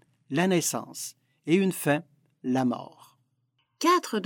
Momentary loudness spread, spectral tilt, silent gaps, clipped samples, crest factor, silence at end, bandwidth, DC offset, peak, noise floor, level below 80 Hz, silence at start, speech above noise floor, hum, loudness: 14 LU; -4.5 dB/octave; none; under 0.1%; 18 dB; 0 s; 19 kHz; under 0.1%; -10 dBFS; -74 dBFS; -78 dBFS; 0.3 s; 48 dB; none; -27 LUFS